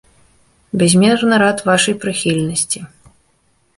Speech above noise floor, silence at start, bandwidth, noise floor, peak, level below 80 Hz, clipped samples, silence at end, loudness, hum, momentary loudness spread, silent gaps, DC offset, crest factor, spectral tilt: 45 dB; 0.75 s; 11.5 kHz; -59 dBFS; 0 dBFS; -52 dBFS; under 0.1%; 0.9 s; -14 LUFS; none; 8 LU; none; under 0.1%; 16 dB; -4 dB/octave